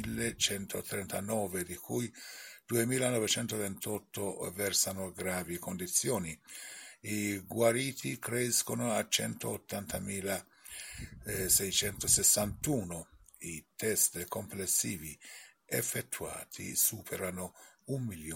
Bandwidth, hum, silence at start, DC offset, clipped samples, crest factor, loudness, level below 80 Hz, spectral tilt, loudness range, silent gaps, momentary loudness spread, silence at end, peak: 17 kHz; none; 0 s; under 0.1%; under 0.1%; 22 dB; -33 LUFS; -60 dBFS; -2.5 dB/octave; 4 LU; none; 16 LU; 0 s; -12 dBFS